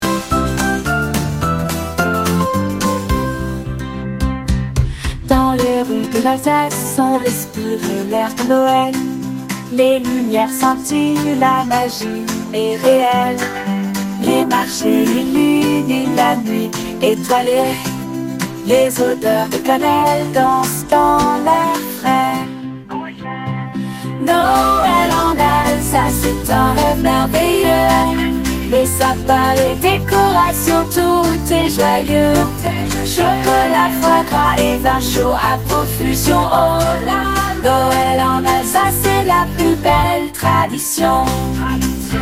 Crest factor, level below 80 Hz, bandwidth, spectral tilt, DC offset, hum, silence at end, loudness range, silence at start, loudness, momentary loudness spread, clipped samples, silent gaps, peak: 14 dB; -30 dBFS; 16.5 kHz; -5 dB/octave; 0.2%; none; 0 s; 4 LU; 0 s; -15 LUFS; 8 LU; under 0.1%; none; 0 dBFS